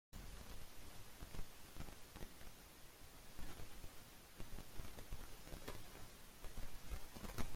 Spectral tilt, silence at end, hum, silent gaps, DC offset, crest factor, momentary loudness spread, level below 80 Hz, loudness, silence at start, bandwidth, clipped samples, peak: -4 dB/octave; 0 s; none; none; under 0.1%; 20 dB; 6 LU; -56 dBFS; -57 LUFS; 0.15 s; 16.5 kHz; under 0.1%; -28 dBFS